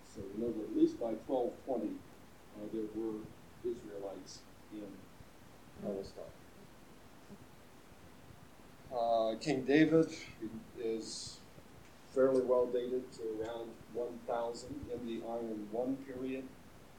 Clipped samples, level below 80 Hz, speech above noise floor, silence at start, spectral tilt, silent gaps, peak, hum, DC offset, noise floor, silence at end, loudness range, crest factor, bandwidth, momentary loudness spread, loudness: under 0.1%; -68 dBFS; 22 dB; 0 s; -6 dB/octave; none; -16 dBFS; none; under 0.1%; -59 dBFS; 0 s; 15 LU; 22 dB; 17.5 kHz; 26 LU; -37 LUFS